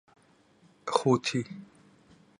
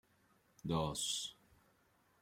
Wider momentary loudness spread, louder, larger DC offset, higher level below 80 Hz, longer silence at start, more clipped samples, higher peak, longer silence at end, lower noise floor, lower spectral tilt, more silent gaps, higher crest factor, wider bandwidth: first, 17 LU vs 11 LU; first, -28 LUFS vs -40 LUFS; neither; second, -72 dBFS vs -64 dBFS; first, 0.85 s vs 0.65 s; neither; first, -6 dBFS vs -22 dBFS; second, 0.75 s vs 0.9 s; second, -63 dBFS vs -74 dBFS; about the same, -5 dB/octave vs -4 dB/octave; neither; about the same, 26 dB vs 22 dB; second, 11.5 kHz vs 16.5 kHz